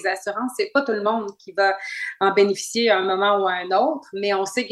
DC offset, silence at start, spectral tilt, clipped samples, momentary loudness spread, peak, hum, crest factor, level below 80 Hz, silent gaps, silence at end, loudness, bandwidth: under 0.1%; 0 s; -3 dB/octave; under 0.1%; 8 LU; -4 dBFS; none; 18 dB; -74 dBFS; none; 0 s; -21 LUFS; 12.5 kHz